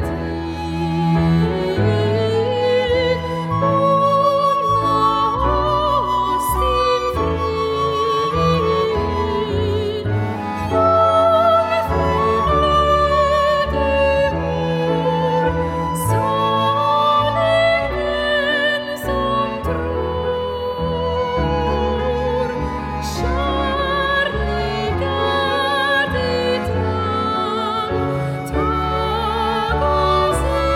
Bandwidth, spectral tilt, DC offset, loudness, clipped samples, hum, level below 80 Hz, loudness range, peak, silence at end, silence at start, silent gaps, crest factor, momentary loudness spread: 16 kHz; -6 dB/octave; under 0.1%; -18 LUFS; under 0.1%; none; -30 dBFS; 4 LU; -4 dBFS; 0 s; 0 s; none; 14 dB; 7 LU